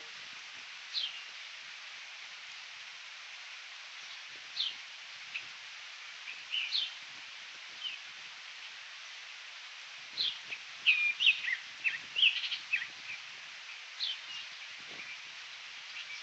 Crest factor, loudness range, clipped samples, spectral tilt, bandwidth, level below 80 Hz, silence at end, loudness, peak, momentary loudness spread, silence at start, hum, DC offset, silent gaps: 24 dB; 12 LU; under 0.1%; 2.5 dB/octave; 8.4 kHz; under -90 dBFS; 0 s; -36 LUFS; -14 dBFS; 18 LU; 0 s; none; under 0.1%; none